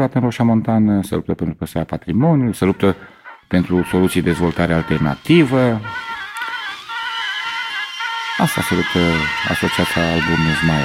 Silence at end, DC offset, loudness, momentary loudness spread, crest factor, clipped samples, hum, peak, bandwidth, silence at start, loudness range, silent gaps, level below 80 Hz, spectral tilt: 0 s; under 0.1%; -18 LUFS; 9 LU; 16 dB; under 0.1%; none; -2 dBFS; 16 kHz; 0 s; 3 LU; none; -40 dBFS; -6 dB/octave